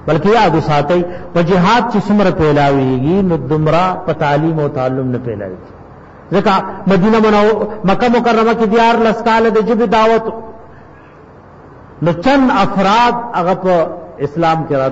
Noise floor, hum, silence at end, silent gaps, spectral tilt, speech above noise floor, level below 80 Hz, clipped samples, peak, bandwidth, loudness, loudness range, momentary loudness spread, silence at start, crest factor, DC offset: -38 dBFS; none; 0 s; none; -7 dB/octave; 26 dB; -38 dBFS; under 0.1%; -2 dBFS; 8 kHz; -13 LUFS; 4 LU; 8 LU; 0 s; 10 dB; under 0.1%